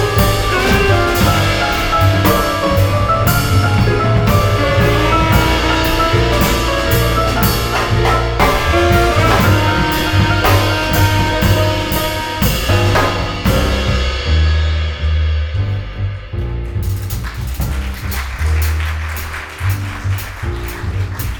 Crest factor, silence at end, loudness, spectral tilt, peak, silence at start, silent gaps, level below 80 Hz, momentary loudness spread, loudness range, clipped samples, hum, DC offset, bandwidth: 14 dB; 0 s; -15 LUFS; -5 dB/octave; 0 dBFS; 0 s; none; -20 dBFS; 10 LU; 7 LU; under 0.1%; none; under 0.1%; over 20 kHz